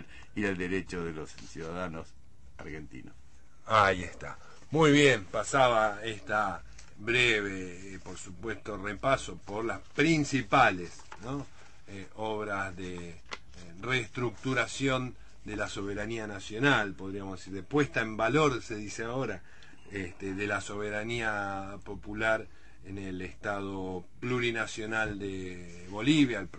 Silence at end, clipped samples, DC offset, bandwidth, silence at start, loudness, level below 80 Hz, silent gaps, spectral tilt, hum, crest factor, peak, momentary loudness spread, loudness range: 0 s; under 0.1%; 0.5%; 8.8 kHz; 0 s; -30 LUFS; -54 dBFS; none; -5 dB/octave; none; 22 dB; -10 dBFS; 19 LU; 8 LU